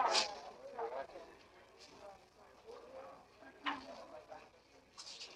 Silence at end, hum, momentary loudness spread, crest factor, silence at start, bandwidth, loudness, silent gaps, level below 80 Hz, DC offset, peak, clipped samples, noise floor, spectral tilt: 0 s; none; 18 LU; 26 dB; 0 s; 14 kHz; -44 LUFS; none; -78 dBFS; under 0.1%; -20 dBFS; under 0.1%; -65 dBFS; -0.5 dB/octave